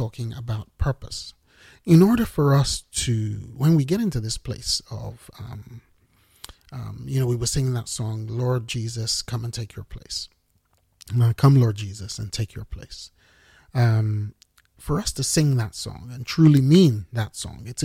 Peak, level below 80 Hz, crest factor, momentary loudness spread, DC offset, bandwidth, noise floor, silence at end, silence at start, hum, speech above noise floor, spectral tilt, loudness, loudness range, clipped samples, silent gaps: -4 dBFS; -42 dBFS; 18 dB; 21 LU; under 0.1%; 16 kHz; -66 dBFS; 0 s; 0 s; none; 44 dB; -6 dB/octave; -22 LUFS; 8 LU; under 0.1%; none